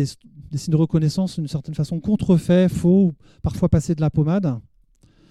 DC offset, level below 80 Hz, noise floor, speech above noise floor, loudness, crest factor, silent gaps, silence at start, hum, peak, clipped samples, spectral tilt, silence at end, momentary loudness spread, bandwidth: under 0.1%; -42 dBFS; -56 dBFS; 37 dB; -20 LUFS; 16 dB; none; 0 s; none; -4 dBFS; under 0.1%; -8 dB/octave; 0.7 s; 11 LU; 12.5 kHz